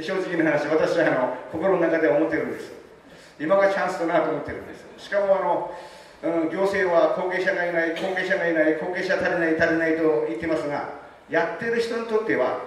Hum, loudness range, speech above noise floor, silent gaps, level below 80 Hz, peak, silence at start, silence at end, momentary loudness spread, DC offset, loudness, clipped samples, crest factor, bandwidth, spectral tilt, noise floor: none; 2 LU; 25 dB; none; -60 dBFS; -8 dBFS; 0 s; 0 s; 11 LU; under 0.1%; -23 LUFS; under 0.1%; 16 dB; 12.5 kHz; -6 dB/octave; -48 dBFS